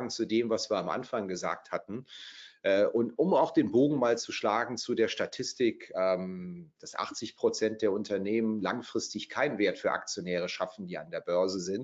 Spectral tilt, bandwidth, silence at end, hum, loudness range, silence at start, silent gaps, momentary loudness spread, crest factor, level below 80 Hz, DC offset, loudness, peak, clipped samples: -4.5 dB/octave; 8 kHz; 0 s; none; 4 LU; 0 s; none; 12 LU; 18 dB; -76 dBFS; under 0.1%; -31 LUFS; -14 dBFS; under 0.1%